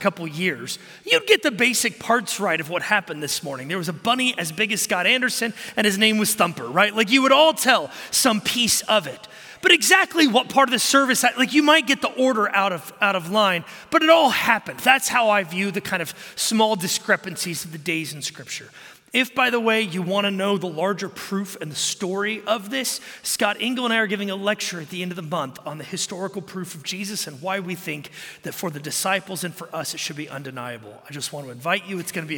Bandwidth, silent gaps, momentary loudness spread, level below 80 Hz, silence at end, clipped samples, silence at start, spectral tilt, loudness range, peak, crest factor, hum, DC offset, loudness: 17.5 kHz; none; 14 LU; -68 dBFS; 0 s; under 0.1%; 0 s; -2.5 dB/octave; 10 LU; -2 dBFS; 20 dB; none; under 0.1%; -21 LUFS